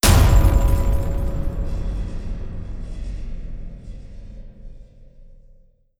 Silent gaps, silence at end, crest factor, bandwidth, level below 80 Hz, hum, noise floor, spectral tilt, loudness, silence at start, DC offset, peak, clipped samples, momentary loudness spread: none; 0.65 s; 18 dB; 19 kHz; -22 dBFS; none; -51 dBFS; -5 dB/octave; -22 LUFS; 0.05 s; under 0.1%; -2 dBFS; under 0.1%; 25 LU